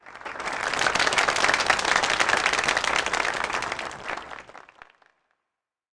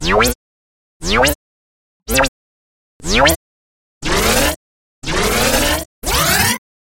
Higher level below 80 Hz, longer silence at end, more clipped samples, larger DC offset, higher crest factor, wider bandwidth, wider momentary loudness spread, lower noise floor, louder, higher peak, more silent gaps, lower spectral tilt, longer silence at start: second, -54 dBFS vs -28 dBFS; first, 1.4 s vs 0.4 s; neither; neither; about the same, 18 dB vs 18 dB; second, 10.5 kHz vs 17 kHz; about the same, 13 LU vs 14 LU; second, -85 dBFS vs under -90 dBFS; second, -23 LUFS vs -15 LUFS; second, -8 dBFS vs 0 dBFS; second, none vs 0.35-1.00 s, 1.35-2.00 s, 2.28-3.00 s, 3.36-4.01 s, 4.56-5.02 s, 5.85-6.02 s; second, -1 dB/octave vs -2.5 dB/octave; about the same, 0.05 s vs 0 s